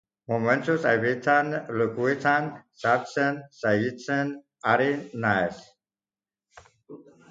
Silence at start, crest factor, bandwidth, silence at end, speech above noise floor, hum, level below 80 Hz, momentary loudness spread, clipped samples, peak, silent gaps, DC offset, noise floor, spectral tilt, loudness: 0.3 s; 20 dB; 7.8 kHz; 0.3 s; over 65 dB; none; -66 dBFS; 8 LU; under 0.1%; -6 dBFS; none; under 0.1%; under -90 dBFS; -6.5 dB/octave; -25 LUFS